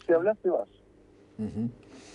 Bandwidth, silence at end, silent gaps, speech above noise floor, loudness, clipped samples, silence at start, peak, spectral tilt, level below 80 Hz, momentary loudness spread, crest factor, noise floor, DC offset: 10 kHz; 0.05 s; none; 30 dB; -30 LUFS; under 0.1%; 0.1 s; -14 dBFS; -8 dB/octave; -62 dBFS; 22 LU; 16 dB; -57 dBFS; under 0.1%